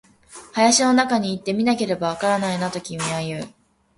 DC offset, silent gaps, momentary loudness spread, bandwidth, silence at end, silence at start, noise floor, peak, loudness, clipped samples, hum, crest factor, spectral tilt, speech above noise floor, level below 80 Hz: under 0.1%; none; 13 LU; 11.5 kHz; 0.5 s; 0.3 s; -45 dBFS; -4 dBFS; -21 LUFS; under 0.1%; none; 18 dB; -3.5 dB/octave; 24 dB; -60 dBFS